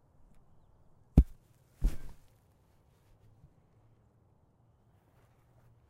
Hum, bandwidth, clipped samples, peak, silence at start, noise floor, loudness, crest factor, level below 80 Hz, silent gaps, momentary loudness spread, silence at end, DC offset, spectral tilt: none; 11.5 kHz; under 0.1%; -8 dBFS; 1.15 s; -67 dBFS; -32 LUFS; 28 dB; -38 dBFS; none; 23 LU; 3.75 s; under 0.1%; -9 dB/octave